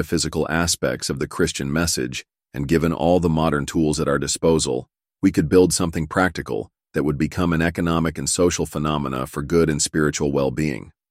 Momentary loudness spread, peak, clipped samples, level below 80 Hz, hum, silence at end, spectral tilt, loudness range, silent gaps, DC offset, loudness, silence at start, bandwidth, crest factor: 8 LU; -2 dBFS; under 0.1%; -40 dBFS; none; 0.2 s; -4.5 dB/octave; 2 LU; none; under 0.1%; -21 LUFS; 0 s; 16 kHz; 18 dB